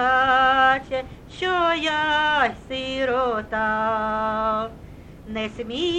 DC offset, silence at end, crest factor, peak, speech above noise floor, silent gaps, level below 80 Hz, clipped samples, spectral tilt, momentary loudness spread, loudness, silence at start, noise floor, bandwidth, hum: under 0.1%; 0 s; 16 dB; -6 dBFS; 18 dB; none; -46 dBFS; under 0.1%; -4.5 dB/octave; 13 LU; -22 LUFS; 0 s; -41 dBFS; 9.8 kHz; none